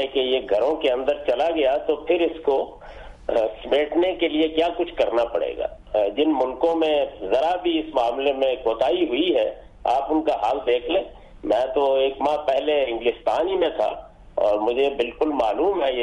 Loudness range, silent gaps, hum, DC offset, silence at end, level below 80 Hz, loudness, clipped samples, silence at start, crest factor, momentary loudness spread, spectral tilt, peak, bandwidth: 1 LU; none; none; under 0.1%; 0 s; -48 dBFS; -22 LUFS; under 0.1%; 0 s; 12 dB; 5 LU; -5 dB/octave; -10 dBFS; 10 kHz